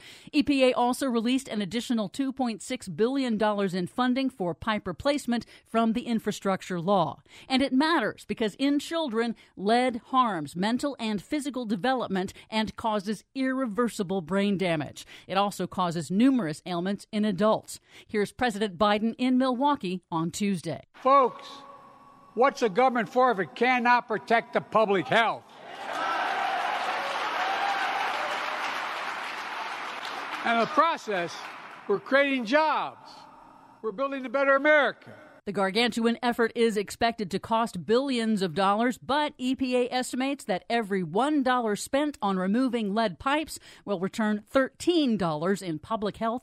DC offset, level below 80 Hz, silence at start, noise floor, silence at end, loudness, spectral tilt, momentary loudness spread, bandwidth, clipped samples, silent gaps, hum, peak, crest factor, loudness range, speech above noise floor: under 0.1%; -62 dBFS; 0 s; -53 dBFS; 0.05 s; -27 LUFS; -5 dB/octave; 9 LU; 15 kHz; under 0.1%; none; none; -8 dBFS; 18 dB; 4 LU; 26 dB